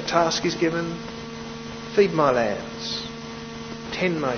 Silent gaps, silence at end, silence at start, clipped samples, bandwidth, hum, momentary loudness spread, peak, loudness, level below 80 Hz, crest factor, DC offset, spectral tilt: none; 0 s; 0 s; under 0.1%; 6.6 kHz; none; 14 LU; -6 dBFS; -25 LUFS; -52 dBFS; 20 dB; under 0.1%; -4.5 dB/octave